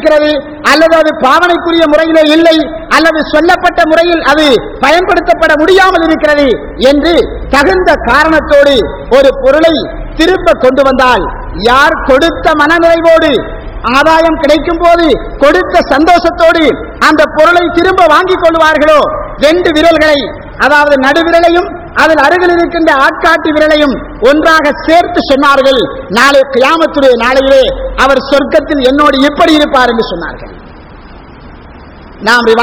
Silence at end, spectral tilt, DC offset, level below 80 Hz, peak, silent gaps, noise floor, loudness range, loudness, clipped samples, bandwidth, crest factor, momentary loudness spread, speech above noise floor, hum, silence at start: 0 s; -4.5 dB/octave; 0.3%; -28 dBFS; 0 dBFS; none; -30 dBFS; 1 LU; -7 LUFS; 8%; over 20 kHz; 6 dB; 5 LU; 24 dB; none; 0 s